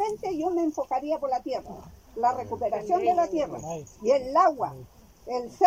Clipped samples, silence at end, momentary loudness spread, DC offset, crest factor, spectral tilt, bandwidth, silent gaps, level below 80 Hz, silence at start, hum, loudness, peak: under 0.1%; 0 s; 14 LU; under 0.1%; 20 dB; -5.5 dB/octave; 16 kHz; none; -58 dBFS; 0 s; none; -27 LUFS; -8 dBFS